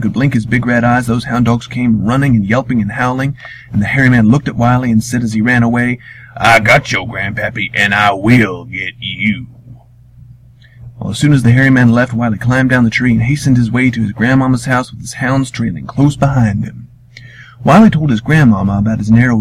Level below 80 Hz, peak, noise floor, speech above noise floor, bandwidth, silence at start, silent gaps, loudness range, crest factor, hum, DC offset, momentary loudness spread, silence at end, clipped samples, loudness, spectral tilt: -36 dBFS; 0 dBFS; -40 dBFS; 28 dB; 13.5 kHz; 0 s; none; 4 LU; 12 dB; none; under 0.1%; 10 LU; 0 s; 0.1%; -12 LUFS; -6.5 dB/octave